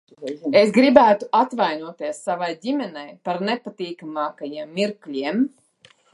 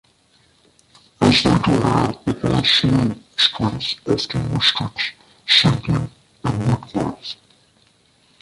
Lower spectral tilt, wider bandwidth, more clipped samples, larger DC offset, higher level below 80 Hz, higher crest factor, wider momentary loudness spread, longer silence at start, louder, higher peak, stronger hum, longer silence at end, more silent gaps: about the same, -5.5 dB/octave vs -5 dB/octave; about the same, 11.5 kHz vs 11.5 kHz; neither; neither; second, -64 dBFS vs -42 dBFS; about the same, 20 dB vs 20 dB; first, 17 LU vs 12 LU; second, 0.2 s vs 1.2 s; second, -21 LUFS vs -18 LUFS; about the same, 0 dBFS vs 0 dBFS; neither; second, 0.65 s vs 1.05 s; neither